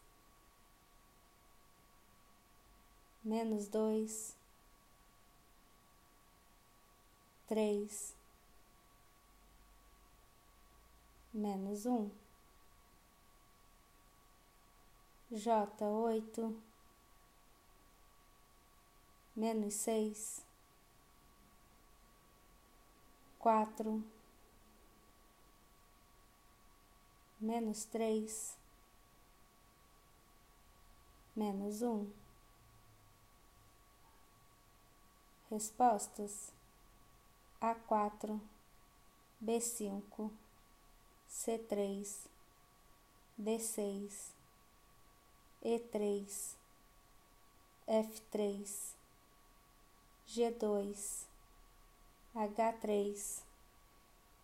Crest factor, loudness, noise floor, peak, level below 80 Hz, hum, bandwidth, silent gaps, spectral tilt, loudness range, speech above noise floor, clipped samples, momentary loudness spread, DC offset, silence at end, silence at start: 24 dB; -40 LUFS; -67 dBFS; -20 dBFS; -70 dBFS; none; 16 kHz; none; -4.5 dB/octave; 7 LU; 29 dB; under 0.1%; 14 LU; under 0.1%; 1 s; 3.25 s